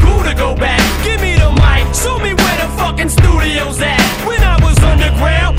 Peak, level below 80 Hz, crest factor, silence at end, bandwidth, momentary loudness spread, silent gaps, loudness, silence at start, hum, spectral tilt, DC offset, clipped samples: 0 dBFS; -14 dBFS; 10 dB; 0 s; 16.5 kHz; 5 LU; none; -12 LUFS; 0 s; none; -4.5 dB/octave; under 0.1%; 0.7%